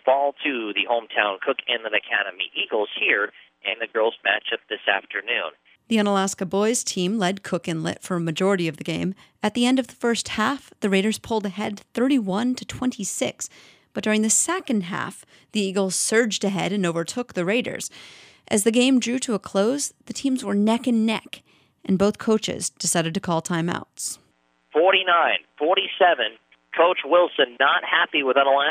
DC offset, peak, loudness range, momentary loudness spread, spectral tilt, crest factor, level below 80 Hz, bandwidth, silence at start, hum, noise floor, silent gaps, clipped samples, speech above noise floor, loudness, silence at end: under 0.1%; -2 dBFS; 4 LU; 10 LU; -3.5 dB/octave; 20 dB; -64 dBFS; 15.5 kHz; 0.05 s; none; -63 dBFS; none; under 0.1%; 40 dB; -22 LUFS; 0 s